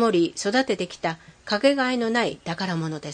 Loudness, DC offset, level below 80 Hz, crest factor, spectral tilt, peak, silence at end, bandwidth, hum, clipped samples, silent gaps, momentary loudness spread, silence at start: -24 LUFS; under 0.1%; -62 dBFS; 18 dB; -4.5 dB/octave; -6 dBFS; 0 s; 9.8 kHz; none; under 0.1%; none; 9 LU; 0 s